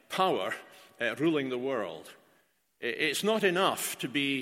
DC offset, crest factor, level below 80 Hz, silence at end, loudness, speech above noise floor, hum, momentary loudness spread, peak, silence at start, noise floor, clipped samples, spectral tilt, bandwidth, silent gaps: under 0.1%; 20 dB; -78 dBFS; 0 s; -30 LUFS; 39 dB; none; 10 LU; -12 dBFS; 0.1 s; -69 dBFS; under 0.1%; -3.5 dB/octave; 16.5 kHz; none